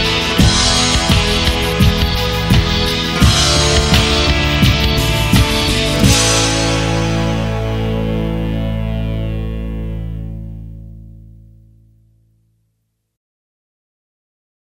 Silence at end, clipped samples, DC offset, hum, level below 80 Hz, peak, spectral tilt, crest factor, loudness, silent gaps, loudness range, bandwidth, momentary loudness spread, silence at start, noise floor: 3.4 s; under 0.1%; under 0.1%; none; -22 dBFS; 0 dBFS; -4 dB/octave; 16 dB; -14 LUFS; none; 14 LU; 16.5 kHz; 13 LU; 0 s; -68 dBFS